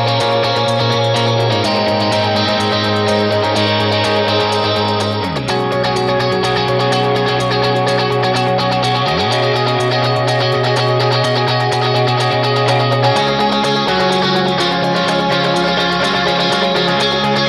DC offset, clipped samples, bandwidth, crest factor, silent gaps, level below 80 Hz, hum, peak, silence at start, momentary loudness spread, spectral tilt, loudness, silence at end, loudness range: under 0.1%; under 0.1%; 13.5 kHz; 12 dB; none; -46 dBFS; none; -2 dBFS; 0 s; 1 LU; -5 dB/octave; -14 LUFS; 0 s; 1 LU